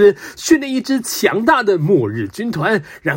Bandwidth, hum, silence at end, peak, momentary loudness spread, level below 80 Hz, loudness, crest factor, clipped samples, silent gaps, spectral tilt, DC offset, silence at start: 16.5 kHz; none; 0 s; 0 dBFS; 9 LU; -54 dBFS; -16 LUFS; 16 dB; under 0.1%; none; -5 dB/octave; under 0.1%; 0 s